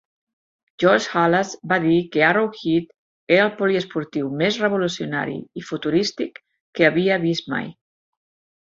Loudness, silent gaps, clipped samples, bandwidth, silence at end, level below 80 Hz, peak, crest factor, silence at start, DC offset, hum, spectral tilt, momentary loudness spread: -20 LUFS; 2.98-3.27 s, 6.61-6.73 s; under 0.1%; 7.8 kHz; 0.95 s; -62 dBFS; -2 dBFS; 20 dB; 0.8 s; under 0.1%; none; -5.5 dB/octave; 11 LU